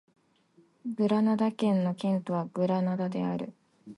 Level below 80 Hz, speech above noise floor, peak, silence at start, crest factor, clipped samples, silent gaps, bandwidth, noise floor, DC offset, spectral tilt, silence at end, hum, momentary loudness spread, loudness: -76 dBFS; 36 dB; -14 dBFS; 0.85 s; 16 dB; under 0.1%; none; 11 kHz; -64 dBFS; under 0.1%; -8.5 dB/octave; 0.05 s; none; 11 LU; -29 LUFS